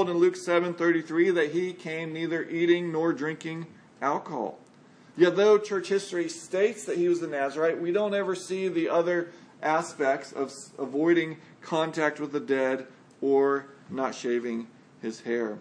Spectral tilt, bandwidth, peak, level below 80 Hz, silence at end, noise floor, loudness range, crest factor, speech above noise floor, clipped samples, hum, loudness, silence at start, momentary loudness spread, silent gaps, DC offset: -5.5 dB/octave; 10.5 kHz; -8 dBFS; -84 dBFS; 0 s; -55 dBFS; 3 LU; 20 dB; 28 dB; under 0.1%; none; -27 LUFS; 0 s; 11 LU; none; under 0.1%